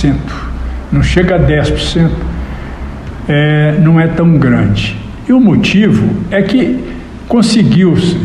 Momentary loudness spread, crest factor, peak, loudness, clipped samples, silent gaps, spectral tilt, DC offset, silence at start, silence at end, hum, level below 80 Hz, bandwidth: 14 LU; 10 dB; 0 dBFS; -10 LUFS; under 0.1%; none; -7 dB/octave; under 0.1%; 0 s; 0 s; none; -22 dBFS; 11 kHz